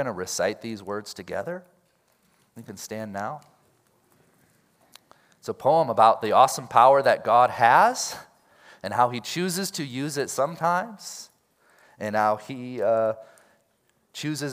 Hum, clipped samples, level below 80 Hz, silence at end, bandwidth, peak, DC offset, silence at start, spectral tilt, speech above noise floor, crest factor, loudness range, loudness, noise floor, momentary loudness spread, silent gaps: none; under 0.1%; -74 dBFS; 0 s; 16 kHz; -2 dBFS; under 0.1%; 0 s; -4 dB/octave; 45 dB; 22 dB; 19 LU; -23 LUFS; -68 dBFS; 20 LU; none